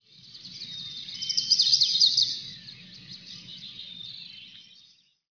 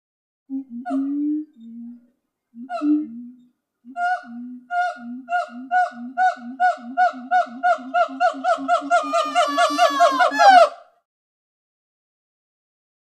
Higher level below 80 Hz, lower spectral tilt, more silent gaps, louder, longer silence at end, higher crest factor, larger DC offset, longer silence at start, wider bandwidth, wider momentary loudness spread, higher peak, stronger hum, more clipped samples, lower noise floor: first, -74 dBFS vs -84 dBFS; second, 1 dB/octave vs -2 dB/octave; neither; about the same, -20 LUFS vs -20 LUFS; second, 0.7 s vs 2.3 s; about the same, 20 dB vs 20 dB; neither; second, 0.35 s vs 0.5 s; second, 5.4 kHz vs 12.5 kHz; first, 25 LU vs 19 LU; second, -8 dBFS vs 0 dBFS; neither; neither; about the same, -60 dBFS vs -57 dBFS